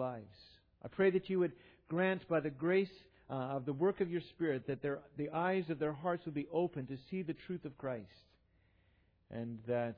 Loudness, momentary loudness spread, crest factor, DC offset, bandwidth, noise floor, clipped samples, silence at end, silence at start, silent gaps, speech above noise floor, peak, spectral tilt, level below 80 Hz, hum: -38 LUFS; 11 LU; 18 dB; under 0.1%; 5.2 kHz; -72 dBFS; under 0.1%; 0.05 s; 0 s; none; 35 dB; -20 dBFS; -6 dB/octave; -72 dBFS; none